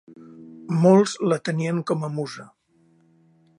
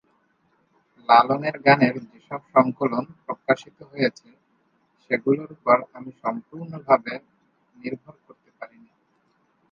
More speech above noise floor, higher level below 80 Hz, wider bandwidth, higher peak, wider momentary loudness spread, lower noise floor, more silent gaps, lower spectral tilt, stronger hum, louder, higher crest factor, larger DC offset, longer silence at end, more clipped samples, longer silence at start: second, 40 dB vs 44 dB; about the same, -72 dBFS vs -70 dBFS; first, 11 kHz vs 7.2 kHz; about the same, -4 dBFS vs -2 dBFS; second, 17 LU vs 20 LU; second, -61 dBFS vs -67 dBFS; neither; about the same, -6.5 dB/octave vs -7 dB/octave; neither; about the same, -22 LUFS vs -22 LUFS; about the same, 20 dB vs 24 dB; neither; about the same, 1.15 s vs 1.05 s; neither; second, 0.1 s vs 1.1 s